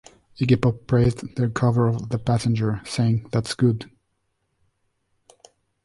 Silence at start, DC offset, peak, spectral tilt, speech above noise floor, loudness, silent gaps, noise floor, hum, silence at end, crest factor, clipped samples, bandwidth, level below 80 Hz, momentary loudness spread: 0.4 s; under 0.1%; -4 dBFS; -7 dB/octave; 52 dB; -22 LUFS; none; -73 dBFS; none; 2 s; 18 dB; under 0.1%; 11.5 kHz; -48 dBFS; 6 LU